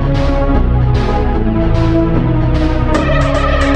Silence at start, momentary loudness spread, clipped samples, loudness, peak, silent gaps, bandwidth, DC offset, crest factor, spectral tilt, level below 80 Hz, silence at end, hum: 0 s; 2 LU; under 0.1%; -14 LUFS; 0 dBFS; none; 8.6 kHz; under 0.1%; 10 dB; -7.5 dB/octave; -14 dBFS; 0 s; none